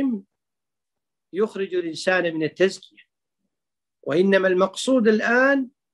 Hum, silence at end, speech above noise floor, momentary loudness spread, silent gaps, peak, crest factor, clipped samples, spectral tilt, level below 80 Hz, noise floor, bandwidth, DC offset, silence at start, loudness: none; 0.25 s; 68 dB; 10 LU; none; -4 dBFS; 18 dB; under 0.1%; -5 dB/octave; -74 dBFS; -89 dBFS; 12 kHz; under 0.1%; 0 s; -21 LUFS